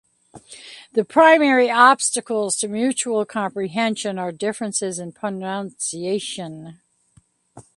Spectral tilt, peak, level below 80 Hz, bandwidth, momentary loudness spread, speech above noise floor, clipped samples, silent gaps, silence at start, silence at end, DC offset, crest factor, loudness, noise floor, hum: -3 dB/octave; 0 dBFS; -68 dBFS; 11.5 kHz; 16 LU; 38 dB; under 0.1%; none; 0.35 s; 0.15 s; under 0.1%; 20 dB; -19 LUFS; -58 dBFS; none